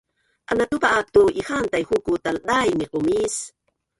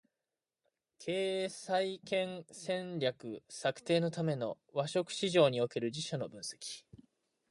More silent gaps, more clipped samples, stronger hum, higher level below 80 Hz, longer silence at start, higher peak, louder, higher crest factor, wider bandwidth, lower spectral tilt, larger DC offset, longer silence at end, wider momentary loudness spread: neither; neither; neither; first, -50 dBFS vs -78 dBFS; second, 0.5 s vs 1 s; first, -4 dBFS vs -14 dBFS; first, -21 LUFS vs -35 LUFS; about the same, 18 dB vs 22 dB; about the same, 11.5 kHz vs 11.5 kHz; about the same, -4 dB/octave vs -5 dB/octave; neither; second, 0.5 s vs 0.7 s; second, 8 LU vs 14 LU